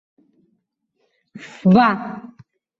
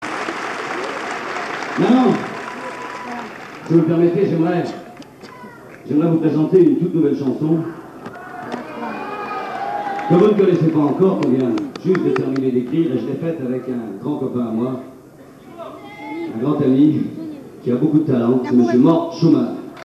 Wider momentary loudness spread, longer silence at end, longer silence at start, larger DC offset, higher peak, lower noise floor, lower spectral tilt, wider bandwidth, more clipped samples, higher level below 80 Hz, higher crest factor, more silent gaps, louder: first, 25 LU vs 19 LU; first, 0.6 s vs 0 s; first, 1.35 s vs 0 s; neither; about the same, -2 dBFS vs -2 dBFS; first, -71 dBFS vs -42 dBFS; about the same, -8.5 dB/octave vs -8 dB/octave; second, 7.4 kHz vs 12.5 kHz; neither; about the same, -60 dBFS vs -62 dBFS; about the same, 20 dB vs 16 dB; neither; about the same, -16 LUFS vs -18 LUFS